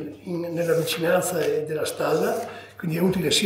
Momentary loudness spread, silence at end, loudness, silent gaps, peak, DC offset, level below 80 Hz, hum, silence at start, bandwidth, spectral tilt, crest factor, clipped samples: 9 LU; 0 s; -24 LUFS; none; -8 dBFS; under 0.1%; -58 dBFS; none; 0 s; 16.5 kHz; -4 dB/octave; 16 dB; under 0.1%